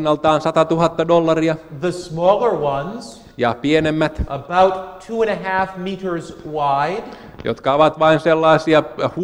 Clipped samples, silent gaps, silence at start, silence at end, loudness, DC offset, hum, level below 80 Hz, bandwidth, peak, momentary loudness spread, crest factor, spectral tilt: under 0.1%; none; 0 s; 0 s; -17 LUFS; under 0.1%; none; -42 dBFS; 15 kHz; -2 dBFS; 13 LU; 16 dB; -6 dB/octave